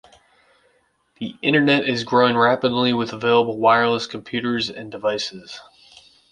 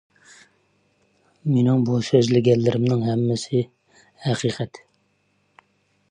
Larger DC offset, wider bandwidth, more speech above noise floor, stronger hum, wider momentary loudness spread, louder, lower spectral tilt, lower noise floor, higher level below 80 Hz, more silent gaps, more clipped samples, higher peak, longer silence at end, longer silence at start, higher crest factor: neither; about the same, 10 kHz vs 10 kHz; about the same, 44 dB vs 47 dB; neither; about the same, 15 LU vs 13 LU; about the same, -19 LUFS vs -21 LUFS; second, -5 dB/octave vs -7 dB/octave; second, -63 dBFS vs -67 dBFS; about the same, -62 dBFS vs -60 dBFS; neither; neither; about the same, -2 dBFS vs -4 dBFS; second, 0.7 s vs 1.35 s; second, 1.2 s vs 1.45 s; about the same, 20 dB vs 20 dB